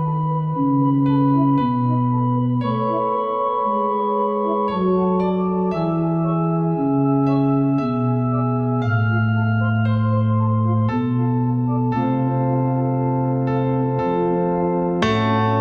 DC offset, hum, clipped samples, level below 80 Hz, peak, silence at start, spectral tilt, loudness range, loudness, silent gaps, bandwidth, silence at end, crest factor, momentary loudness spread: under 0.1%; none; under 0.1%; -50 dBFS; -4 dBFS; 0 s; -9.5 dB/octave; 1 LU; -19 LUFS; none; 6.8 kHz; 0 s; 14 dB; 3 LU